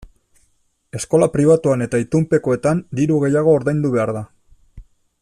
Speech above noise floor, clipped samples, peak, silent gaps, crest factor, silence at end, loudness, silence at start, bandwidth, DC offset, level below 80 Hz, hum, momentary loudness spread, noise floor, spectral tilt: 46 dB; under 0.1%; -2 dBFS; none; 16 dB; 0.4 s; -17 LUFS; 0 s; 12.5 kHz; under 0.1%; -48 dBFS; none; 11 LU; -62 dBFS; -7.5 dB/octave